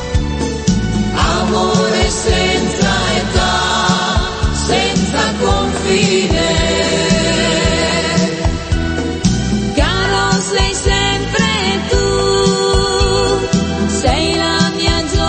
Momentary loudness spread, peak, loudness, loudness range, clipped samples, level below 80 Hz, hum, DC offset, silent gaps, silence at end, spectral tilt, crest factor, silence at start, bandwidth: 4 LU; 0 dBFS; -14 LUFS; 1 LU; under 0.1%; -22 dBFS; none; under 0.1%; none; 0 s; -4 dB/octave; 14 dB; 0 s; 8.8 kHz